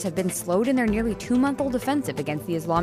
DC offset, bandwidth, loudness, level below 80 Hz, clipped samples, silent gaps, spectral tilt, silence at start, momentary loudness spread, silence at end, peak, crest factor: under 0.1%; 15.5 kHz; -24 LUFS; -46 dBFS; under 0.1%; none; -5.5 dB/octave; 0 s; 6 LU; 0 s; -10 dBFS; 14 dB